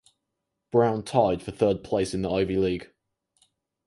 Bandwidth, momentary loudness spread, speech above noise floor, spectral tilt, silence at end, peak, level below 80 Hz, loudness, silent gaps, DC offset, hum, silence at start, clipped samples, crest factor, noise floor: 11.5 kHz; 4 LU; 58 dB; -6.5 dB/octave; 1 s; -6 dBFS; -52 dBFS; -25 LUFS; none; under 0.1%; none; 0.75 s; under 0.1%; 20 dB; -82 dBFS